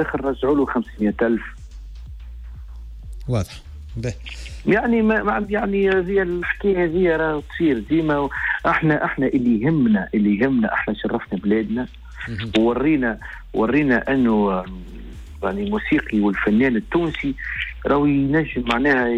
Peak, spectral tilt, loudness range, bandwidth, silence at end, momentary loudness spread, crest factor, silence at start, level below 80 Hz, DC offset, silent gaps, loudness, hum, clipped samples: -6 dBFS; -7.5 dB/octave; 5 LU; 10 kHz; 0 s; 19 LU; 14 dB; 0 s; -38 dBFS; under 0.1%; none; -20 LUFS; none; under 0.1%